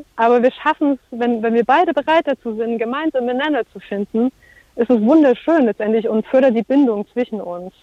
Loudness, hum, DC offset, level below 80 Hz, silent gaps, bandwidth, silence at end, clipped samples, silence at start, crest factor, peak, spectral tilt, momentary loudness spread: -17 LUFS; none; under 0.1%; -58 dBFS; none; 7.8 kHz; 0.15 s; under 0.1%; 0.15 s; 14 dB; -4 dBFS; -7 dB/octave; 9 LU